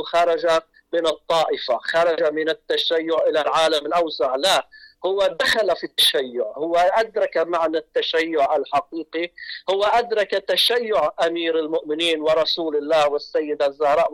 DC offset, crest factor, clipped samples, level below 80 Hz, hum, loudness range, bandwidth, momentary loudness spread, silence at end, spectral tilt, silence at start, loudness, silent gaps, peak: under 0.1%; 10 dB; under 0.1%; -60 dBFS; none; 2 LU; 17.5 kHz; 7 LU; 0 s; -2.5 dB/octave; 0 s; -20 LUFS; none; -10 dBFS